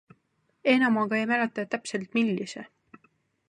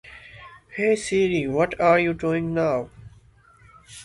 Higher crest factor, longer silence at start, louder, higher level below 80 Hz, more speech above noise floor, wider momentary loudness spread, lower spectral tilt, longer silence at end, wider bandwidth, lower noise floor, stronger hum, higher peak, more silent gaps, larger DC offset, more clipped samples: about the same, 20 dB vs 18 dB; first, 0.65 s vs 0.05 s; second, -26 LUFS vs -22 LUFS; second, -78 dBFS vs -52 dBFS; first, 46 dB vs 32 dB; second, 11 LU vs 23 LU; about the same, -5 dB/octave vs -6 dB/octave; first, 0.85 s vs 0 s; about the same, 10.5 kHz vs 11.5 kHz; first, -72 dBFS vs -54 dBFS; neither; about the same, -8 dBFS vs -6 dBFS; neither; neither; neither